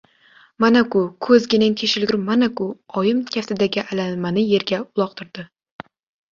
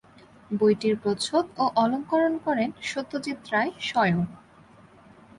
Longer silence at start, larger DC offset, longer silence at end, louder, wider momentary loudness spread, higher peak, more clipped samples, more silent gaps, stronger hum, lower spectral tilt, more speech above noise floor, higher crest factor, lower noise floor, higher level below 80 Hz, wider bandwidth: about the same, 0.6 s vs 0.5 s; neither; second, 0.85 s vs 1 s; first, -19 LUFS vs -26 LUFS; about the same, 10 LU vs 9 LU; first, -2 dBFS vs -10 dBFS; neither; neither; neither; about the same, -5.5 dB/octave vs -5.5 dB/octave; first, 34 dB vs 28 dB; about the same, 18 dB vs 16 dB; about the same, -53 dBFS vs -53 dBFS; about the same, -60 dBFS vs -62 dBFS; second, 7.4 kHz vs 11.5 kHz